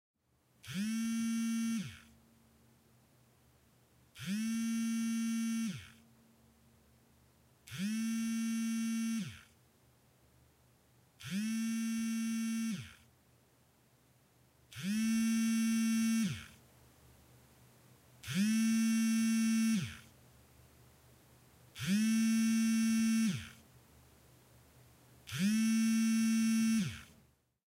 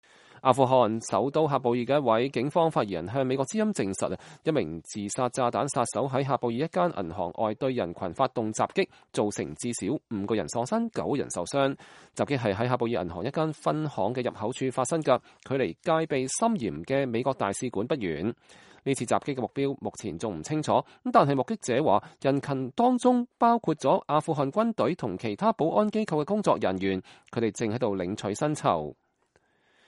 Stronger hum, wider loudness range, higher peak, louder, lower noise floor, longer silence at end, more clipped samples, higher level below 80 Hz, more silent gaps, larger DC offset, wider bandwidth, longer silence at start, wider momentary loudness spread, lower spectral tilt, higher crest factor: neither; first, 7 LU vs 4 LU; second, -24 dBFS vs -6 dBFS; second, -34 LUFS vs -28 LUFS; about the same, -72 dBFS vs -69 dBFS; second, 0.7 s vs 0.95 s; neither; second, -72 dBFS vs -62 dBFS; neither; neither; first, 16 kHz vs 11.5 kHz; first, 0.65 s vs 0.35 s; first, 16 LU vs 8 LU; second, -4 dB/octave vs -5.5 dB/octave; second, 14 dB vs 22 dB